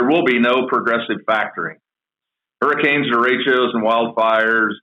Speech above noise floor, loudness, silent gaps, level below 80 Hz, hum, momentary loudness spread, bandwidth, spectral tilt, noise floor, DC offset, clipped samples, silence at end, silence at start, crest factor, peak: 70 dB; -16 LUFS; none; -70 dBFS; none; 6 LU; 7.2 kHz; -6.5 dB/octave; -87 dBFS; under 0.1%; under 0.1%; 0.05 s; 0 s; 12 dB; -6 dBFS